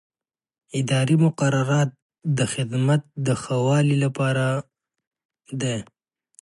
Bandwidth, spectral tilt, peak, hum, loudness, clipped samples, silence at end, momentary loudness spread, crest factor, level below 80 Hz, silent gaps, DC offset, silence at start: 11.5 kHz; -6 dB/octave; -8 dBFS; none; -23 LUFS; under 0.1%; 0.6 s; 9 LU; 16 dB; -62 dBFS; 2.02-2.09 s, 5.07-5.11 s, 5.25-5.29 s; under 0.1%; 0.75 s